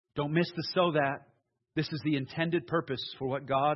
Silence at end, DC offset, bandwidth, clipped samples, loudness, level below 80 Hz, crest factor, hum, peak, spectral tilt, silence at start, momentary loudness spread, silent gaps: 0 s; under 0.1%; 6 kHz; under 0.1%; -31 LUFS; -66 dBFS; 18 dB; none; -14 dBFS; -8 dB/octave; 0.15 s; 8 LU; none